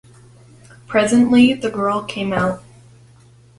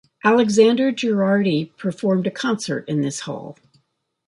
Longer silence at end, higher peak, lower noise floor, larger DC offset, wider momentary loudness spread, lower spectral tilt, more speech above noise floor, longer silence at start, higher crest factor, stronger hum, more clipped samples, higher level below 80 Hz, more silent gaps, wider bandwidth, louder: first, 1 s vs 0.75 s; about the same, -2 dBFS vs -2 dBFS; second, -48 dBFS vs -69 dBFS; neither; second, 10 LU vs 13 LU; about the same, -5.5 dB/octave vs -5.5 dB/octave; second, 32 dB vs 50 dB; first, 0.9 s vs 0.25 s; about the same, 16 dB vs 18 dB; neither; neither; first, -52 dBFS vs -66 dBFS; neither; about the same, 11.5 kHz vs 11.5 kHz; about the same, -17 LUFS vs -19 LUFS